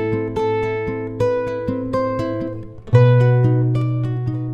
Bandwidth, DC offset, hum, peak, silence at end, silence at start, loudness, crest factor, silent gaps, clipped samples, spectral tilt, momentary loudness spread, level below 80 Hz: 6.2 kHz; under 0.1%; none; -2 dBFS; 0 s; 0 s; -19 LUFS; 16 dB; none; under 0.1%; -9.5 dB/octave; 11 LU; -42 dBFS